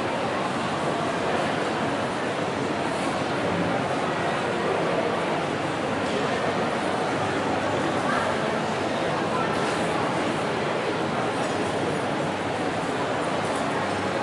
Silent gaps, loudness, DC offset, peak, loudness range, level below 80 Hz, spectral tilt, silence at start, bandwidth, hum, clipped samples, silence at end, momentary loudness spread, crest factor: none; -25 LUFS; under 0.1%; -12 dBFS; 1 LU; -58 dBFS; -5 dB/octave; 0 s; 11.5 kHz; none; under 0.1%; 0 s; 2 LU; 14 dB